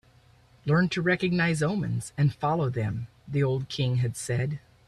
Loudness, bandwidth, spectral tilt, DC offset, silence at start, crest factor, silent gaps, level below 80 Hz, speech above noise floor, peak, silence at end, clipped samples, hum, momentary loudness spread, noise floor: -27 LUFS; 12.5 kHz; -6 dB/octave; under 0.1%; 0.65 s; 14 dB; none; -56 dBFS; 32 dB; -12 dBFS; 0.3 s; under 0.1%; none; 8 LU; -58 dBFS